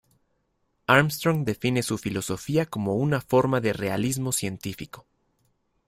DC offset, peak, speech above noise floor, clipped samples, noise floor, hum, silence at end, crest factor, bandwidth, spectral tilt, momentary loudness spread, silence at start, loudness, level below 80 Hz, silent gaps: under 0.1%; -2 dBFS; 48 dB; under 0.1%; -72 dBFS; none; 0.85 s; 24 dB; 16 kHz; -5 dB/octave; 14 LU; 0.9 s; -25 LUFS; -56 dBFS; none